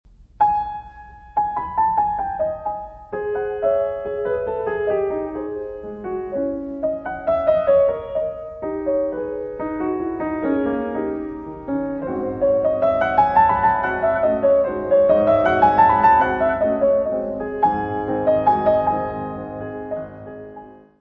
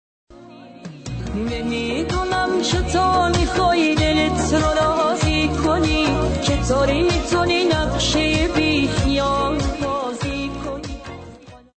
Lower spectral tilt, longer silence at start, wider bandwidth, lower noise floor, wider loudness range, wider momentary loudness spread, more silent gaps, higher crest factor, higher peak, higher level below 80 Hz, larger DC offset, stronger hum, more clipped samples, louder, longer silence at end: first, -9 dB/octave vs -5 dB/octave; about the same, 0.4 s vs 0.3 s; second, 5.4 kHz vs 9 kHz; about the same, -41 dBFS vs -41 dBFS; first, 8 LU vs 3 LU; about the same, 14 LU vs 12 LU; neither; first, 18 dB vs 12 dB; first, -2 dBFS vs -8 dBFS; second, -46 dBFS vs -30 dBFS; neither; neither; neither; about the same, -20 LUFS vs -19 LUFS; about the same, 0.25 s vs 0.2 s